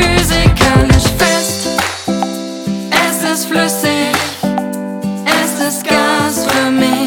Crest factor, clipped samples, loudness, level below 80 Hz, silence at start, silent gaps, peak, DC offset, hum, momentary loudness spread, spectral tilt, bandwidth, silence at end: 12 dB; under 0.1%; -13 LUFS; -24 dBFS; 0 s; none; 0 dBFS; under 0.1%; none; 9 LU; -4 dB/octave; over 20 kHz; 0 s